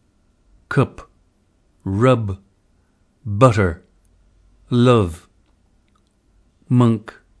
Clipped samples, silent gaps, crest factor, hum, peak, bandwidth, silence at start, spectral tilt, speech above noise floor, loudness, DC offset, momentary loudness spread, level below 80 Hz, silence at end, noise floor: under 0.1%; none; 20 dB; none; 0 dBFS; 11 kHz; 0.7 s; -7.5 dB/octave; 44 dB; -18 LUFS; under 0.1%; 20 LU; -46 dBFS; 0.4 s; -60 dBFS